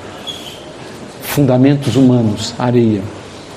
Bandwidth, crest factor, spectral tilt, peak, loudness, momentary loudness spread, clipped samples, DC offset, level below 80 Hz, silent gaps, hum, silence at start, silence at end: 15 kHz; 14 dB; -6.5 dB/octave; 0 dBFS; -13 LUFS; 20 LU; under 0.1%; under 0.1%; -48 dBFS; none; none; 0 s; 0 s